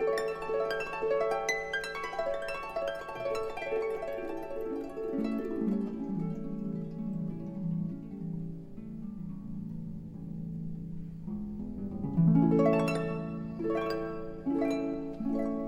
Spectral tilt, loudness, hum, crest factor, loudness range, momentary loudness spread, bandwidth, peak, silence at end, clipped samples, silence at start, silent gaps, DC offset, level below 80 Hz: -7 dB/octave; -34 LUFS; none; 18 dB; 10 LU; 12 LU; 14.5 kHz; -14 dBFS; 0 s; under 0.1%; 0 s; none; under 0.1%; -54 dBFS